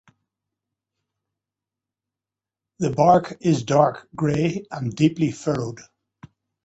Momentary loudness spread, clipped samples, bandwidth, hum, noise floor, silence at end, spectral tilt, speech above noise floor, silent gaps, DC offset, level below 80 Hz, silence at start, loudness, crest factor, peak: 12 LU; under 0.1%; 8.2 kHz; none; -89 dBFS; 0.85 s; -7 dB/octave; 69 dB; none; under 0.1%; -58 dBFS; 2.8 s; -21 LUFS; 22 dB; -2 dBFS